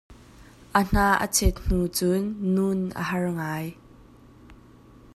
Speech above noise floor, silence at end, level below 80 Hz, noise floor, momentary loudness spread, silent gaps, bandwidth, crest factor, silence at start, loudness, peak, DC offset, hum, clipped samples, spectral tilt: 27 dB; 0.6 s; -36 dBFS; -51 dBFS; 8 LU; none; 15 kHz; 22 dB; 0.1 s; -25 LUFS; -4 dBFS; under 0.1%; none; under 0.1%; -4.5 dB/octave